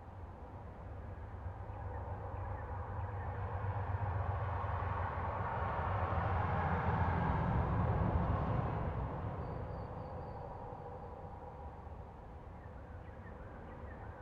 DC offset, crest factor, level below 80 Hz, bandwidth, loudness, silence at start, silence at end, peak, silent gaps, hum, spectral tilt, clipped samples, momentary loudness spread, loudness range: under 0.1%; 16 dB; -46 dBFS; 5 kHz; -39 LUFS; 0 s; 0 s; -22 dBFS; none; none; -9.5 dB/octave; under 0.1%; 16 LU; 13 LU